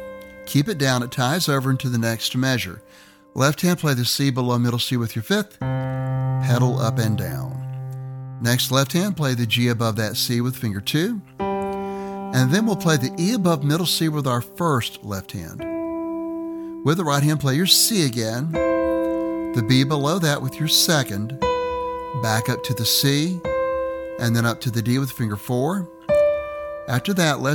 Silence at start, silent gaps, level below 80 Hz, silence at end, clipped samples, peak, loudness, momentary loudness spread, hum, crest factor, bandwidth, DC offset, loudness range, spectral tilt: 0 s; none; -50 dBFS; 0 s; under 0.1%; -2 dBFS; -21 LUFS; 10 LU; none; 20 dB; 19 kHz; under 0.1%; 3 LU; -4.5 dB/octave